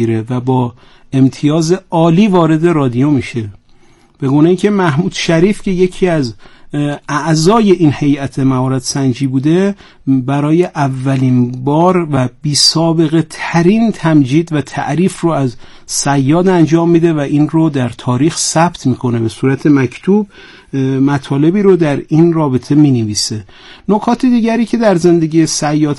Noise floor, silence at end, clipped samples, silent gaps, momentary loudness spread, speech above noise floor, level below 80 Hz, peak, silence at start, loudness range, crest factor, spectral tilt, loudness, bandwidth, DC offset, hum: -44 dBFS; 0 s; under 0.1%; none; 7 LU; 33 dB; -40 dBFS; 0 dBFS; 0 s; 2 LU; 12 dB; -6 dB/octave; -12 LUFS; 12 kHz; under 0.1%; none